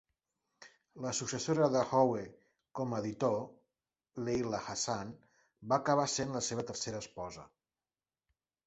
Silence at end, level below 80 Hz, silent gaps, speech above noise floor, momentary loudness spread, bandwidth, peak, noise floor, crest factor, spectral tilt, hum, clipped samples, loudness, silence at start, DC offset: 1.2 s; -68 dBFS; none; over 56 dB; 18 LU; 8.2 kHz; -14 dBFS; under -90 dBFS; 22 dB; -4.5 dB/octave; none; under 0.1%; -35 LUFS; 0.6 s; under 0.1%